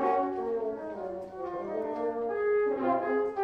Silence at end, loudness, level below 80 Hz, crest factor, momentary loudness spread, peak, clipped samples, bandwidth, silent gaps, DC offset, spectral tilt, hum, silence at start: 0 s; -31 LUFS; -66 dBFS; 16 dB; 10 LU; -14 dBFS; under 0.1%; 5.6 kHz; none; under 0.1%; -7.5 dB/octave; none; 0 s